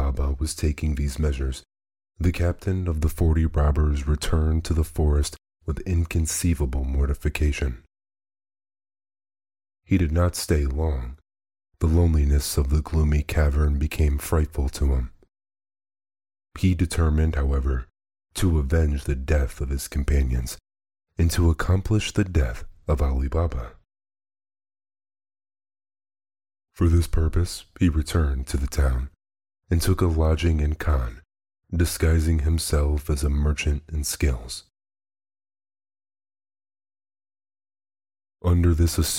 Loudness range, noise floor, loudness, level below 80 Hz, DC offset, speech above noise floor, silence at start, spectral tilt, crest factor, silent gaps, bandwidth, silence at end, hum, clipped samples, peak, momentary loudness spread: 6 LU; under -90 dBFS; -24 LUFS; -26 dBFS; under 0.1%; over 68 dB; 0 s; -6 dB/octave; 16 dB; none; 16.5 kHz; 0 s; none; under 0.1%; -8 dBFS; 8 LU